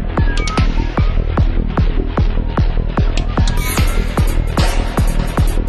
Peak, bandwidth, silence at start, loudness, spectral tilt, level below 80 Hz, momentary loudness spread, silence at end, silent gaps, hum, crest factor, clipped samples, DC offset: 0 dBFS; 13 kHz; 0 s; -18 LUFS; -6 dB/octave; -16 dBFS; 1 LU; 0 s; none; none; 12 dB; under 0.1%; under 0.1%